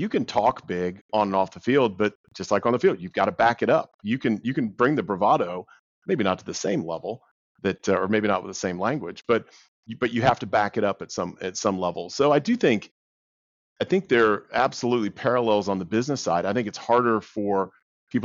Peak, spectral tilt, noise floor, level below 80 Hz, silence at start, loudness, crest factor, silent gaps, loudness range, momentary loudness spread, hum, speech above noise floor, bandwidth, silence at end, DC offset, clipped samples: -6 dBFS; -4.5 dB/octave; under -90 dBFS; -60 dBFS; 0 s; -24 LUFS; 18 dB; 1.01-1.09 s, 2.15-2.24 s, 3.94-3.99 s, 5.79-6.02 s, 7.31-7.55 s, 9.68-9.83 s, 12.91-13.76 s, 17.82-18.07 s; 3 LU; 9 LU; none; over 66 dB; 7.6 kHz; 0 s; under 0.1%; under 0.1%